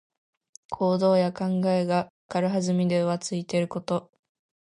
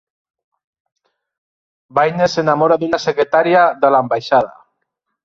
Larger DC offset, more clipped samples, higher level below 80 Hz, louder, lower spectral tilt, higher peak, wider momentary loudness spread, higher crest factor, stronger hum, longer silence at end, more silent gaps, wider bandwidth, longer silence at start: neither; neither; second, -66 dBFS vs -60 dBFS; second, -26 LUFS vs -15 LUFS; about the same, -6.5 dB/octave vs -5.5 dB/octave; second, -10 dBFS vs 0 dBFS; first, 8 LU vs 5 LU; about the same, 16 dB vs 16 dB; neither; about the same, 0.7 s vs 0.75 s; first, 2.10-2.29 s vs none; first, 11 kHz vs 7.6 kHz; second, 0.7 s vs 1.95 s